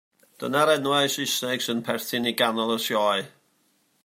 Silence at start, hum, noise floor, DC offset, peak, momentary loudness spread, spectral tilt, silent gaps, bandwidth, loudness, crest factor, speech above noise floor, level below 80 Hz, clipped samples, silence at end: 0.4 s; none; -67 dBFS; under 0.1%; -6 dBFS; 7 LU; -3 dB/octave; none; 16 kHz; -24 LUFS; 20 dB; 43 dB; -74 dBFS; under 0.1%; 0.75 s